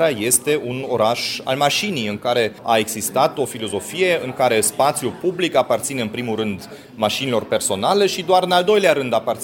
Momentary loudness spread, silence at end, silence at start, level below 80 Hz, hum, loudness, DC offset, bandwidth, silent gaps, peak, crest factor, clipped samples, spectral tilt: 8 LU; 0 s; 0 s; -60 dBFS; none; -19 LUFS; under 0.1%; 17 kHz; none; 0 dBFS; 18 dB; under 0.1%; -3 dB/octave